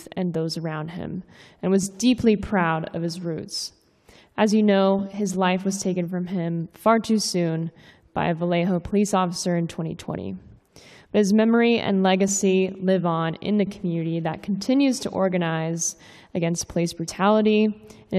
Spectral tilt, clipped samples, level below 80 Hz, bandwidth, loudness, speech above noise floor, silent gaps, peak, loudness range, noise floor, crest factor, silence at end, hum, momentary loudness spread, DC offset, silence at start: -5.5 dB/octave; under 0.1%; -54 dBFS; 14 kHz; -23 LUFS; 32 dB; none; -6 dBFS; 3 LU; -54 dBFS; 18 dB; 0 s; none; 12 LU; under 0.1%; 0 s